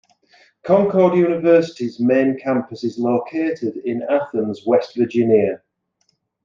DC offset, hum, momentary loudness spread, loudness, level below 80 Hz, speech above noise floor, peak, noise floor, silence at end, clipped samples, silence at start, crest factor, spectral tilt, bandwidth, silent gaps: under 0.1%; none; 9 LU; -18 LUFS; -66 dBFS; 50 dB; -2 dBFS; -67 dBFS; 0.9 s; under 0.1%; 0.65 s; 16 dB; -8 dB/octave; 7.4 kHz; none